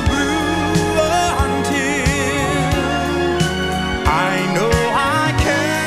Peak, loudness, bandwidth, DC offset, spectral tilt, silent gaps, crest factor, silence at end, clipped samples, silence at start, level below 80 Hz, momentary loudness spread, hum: 0 dBFS; -17 LUFS; 16 kHz; under 0.1%; -4.5 dB/octave; none; 16 dB; 0 s; under 0.1%; 0 s; -28 dBFS; 2 LU; none